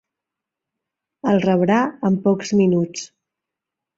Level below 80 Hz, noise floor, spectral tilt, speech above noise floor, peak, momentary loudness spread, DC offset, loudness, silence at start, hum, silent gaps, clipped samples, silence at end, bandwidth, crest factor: -62 dBFS; -85 dBFS; -6.5 dB/octave; 67 dB; -4 dBFS; 10 LU; under 0.1%; -19 LUFS; 1.25 s; none; none; under 0.1%; 0.9 s; 7.8 kHz; 16 dB